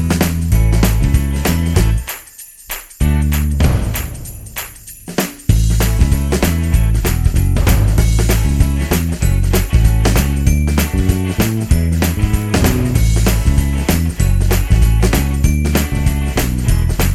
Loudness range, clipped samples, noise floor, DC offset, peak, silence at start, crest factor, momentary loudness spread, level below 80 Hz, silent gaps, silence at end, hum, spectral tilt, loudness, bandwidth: 3 LU; under 0.1%; -37 dBFS; under 0.1%; 0 dBFS; 0 s; 12 dB; 8 LU; -16 dBFS; none; 0 s; none; -5.5 dB/octave; -15 LUFS; 16.5 kHz